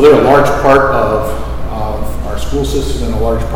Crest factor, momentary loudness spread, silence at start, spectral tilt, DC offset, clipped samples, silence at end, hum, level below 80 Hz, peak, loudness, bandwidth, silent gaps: 10 dB; 13 LU; 0 s; -6 dB/octave; under 0.1%; 2%; 0 s; none; -20 dBFS; 0 dBFS; -13 LUFS; 17 kHz; none